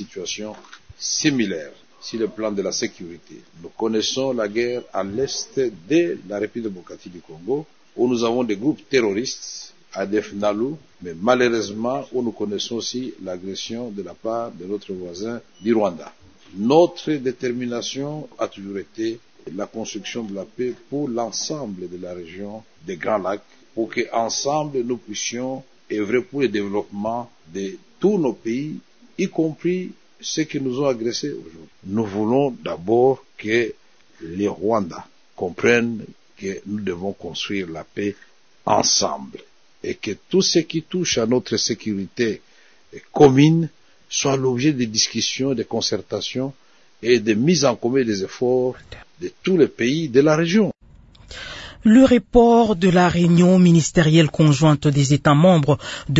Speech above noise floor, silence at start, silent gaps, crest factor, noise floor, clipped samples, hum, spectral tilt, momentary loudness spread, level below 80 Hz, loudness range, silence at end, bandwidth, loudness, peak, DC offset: 28 dB; 0 s; none; 20 dB; -48 dBFS; under 0.1%; none; -5 dB/octave; 17 LU; -50 dBFS; 10 LU; 0 s; 8 kHz; -21 LUFS; -2 dBFS; 0.2%